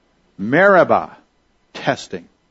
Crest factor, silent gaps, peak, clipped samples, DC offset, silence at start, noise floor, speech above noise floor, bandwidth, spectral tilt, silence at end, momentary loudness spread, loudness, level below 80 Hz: 18 dB; none; 0 dBFS; under 0.1%; under 0.1%; 0.4 s; -61 dBFS; 45 dB; 8 kHz; -6 dB/octave; 0.3 s; 23 LU; -16 LUFS; -60 dBFS